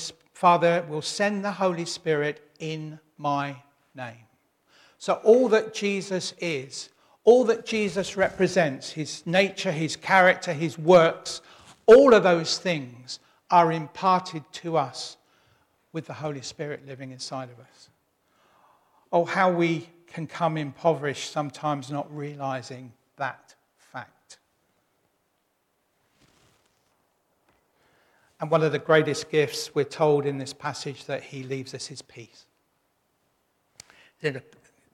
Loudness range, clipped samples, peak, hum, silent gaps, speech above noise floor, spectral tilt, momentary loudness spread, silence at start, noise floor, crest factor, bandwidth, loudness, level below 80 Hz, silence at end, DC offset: 17 LU; under 0.1%; -6 dBFS; none; none; 49 dB; -5 dB/octave; 19 LU; 0 s; -73 dBFS; 20 dB; 13 kHz; -24 LUFS; -66 dBFS; 0.55 s; under 0.1%